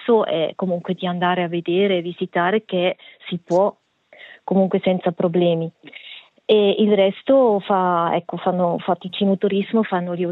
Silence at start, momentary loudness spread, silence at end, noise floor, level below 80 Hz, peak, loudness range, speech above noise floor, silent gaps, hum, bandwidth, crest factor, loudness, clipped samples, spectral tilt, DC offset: 0 s; 11 LU; 0 s; -46 dBFS; -72 dBFS; -4 dBFS; 3 LU; 27 dB; none; none; 7.2 kHz; 16 dB; -20 LUFS; under 0.1%; -8 dB/octave; under 0.1%